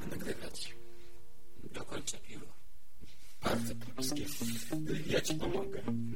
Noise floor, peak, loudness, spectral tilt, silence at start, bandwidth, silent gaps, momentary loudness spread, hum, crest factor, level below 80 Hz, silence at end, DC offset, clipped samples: -60 dBFS; -18 dBFS; -38 LUFS; -4 dB/octave; 0 s; 16.5 kHz; none; 23 LU; none; 22 dB; -56 dBFS; 0 s; 2%; under 0.1%